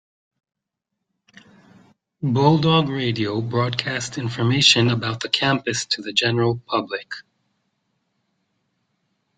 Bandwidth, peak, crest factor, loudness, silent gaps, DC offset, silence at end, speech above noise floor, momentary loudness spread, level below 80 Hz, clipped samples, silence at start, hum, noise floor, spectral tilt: 9.4 kHz; 0 dBFS; 22 dB; -20 LUFS; none; under 0.1%; 2.15 s; 61 dB; 12 LU; -60 dBFS; under 0.1%; 2.2 s; none; -81 dBFS; -4.5 dB/octave